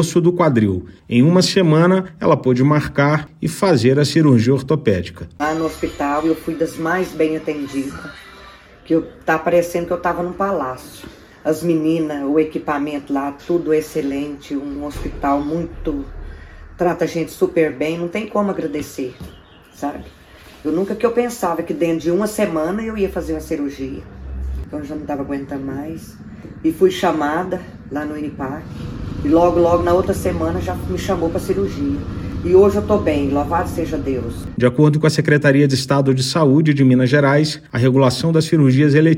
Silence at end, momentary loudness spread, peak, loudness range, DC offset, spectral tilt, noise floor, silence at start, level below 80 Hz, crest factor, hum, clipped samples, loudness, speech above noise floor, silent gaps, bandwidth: 0 s; 14 LU; 0 dBFS; 8 LU; under 0.1%; -6.5 dB/octave; -42 dBFS; 0 s; -38 dBFS; 18 dB; none; under 0.1%; -18 LUFS; 25 dB; none; 16 kHz